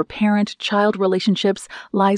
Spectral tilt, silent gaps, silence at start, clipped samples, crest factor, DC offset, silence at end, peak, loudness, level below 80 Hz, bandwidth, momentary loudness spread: -6 dB/octave; none; 0 s; under 0.1%; 14 dB; under 0.1%; 0 s; -6 dBFS; -19 LUFS; -58 dBFS; 10.5 kHz; 5 LU